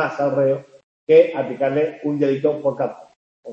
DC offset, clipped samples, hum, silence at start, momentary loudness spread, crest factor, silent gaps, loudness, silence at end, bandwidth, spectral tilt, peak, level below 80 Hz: under 0.1%; under 0.1%; none; 0 s; 12 LU; 16 dB; 0.83-1.07 s, 3.16-3.43 s; -19 LUFS; 0 s; 7.2 kHz; -8 dB/octave; -2 dBFS; -70 dBFS